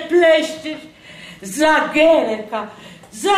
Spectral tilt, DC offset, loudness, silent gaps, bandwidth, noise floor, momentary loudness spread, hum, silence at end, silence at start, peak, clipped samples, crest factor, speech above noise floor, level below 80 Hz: -3 dB/octave; under 0.1%; -16 LUFS; none; 15.5 kHz; -39 dBFS; 21 LU; none; 0 s; 0 s; -4 dBFS; under 0.1%; 14 dB; 23 dB; -54 dBFS